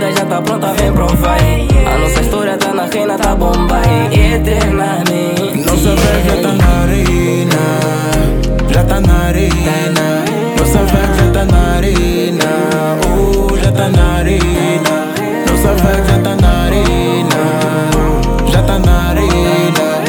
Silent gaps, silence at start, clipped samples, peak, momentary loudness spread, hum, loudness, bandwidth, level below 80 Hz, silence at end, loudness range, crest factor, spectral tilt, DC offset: none; 0 s; under 0.1%; 0 dBFS; 3 LU; none; -12 LUFS; 19 kHz; -16 dBFS; 0 s; 1 LU; 10 dB; -5.5 dB/octave; under 0.1%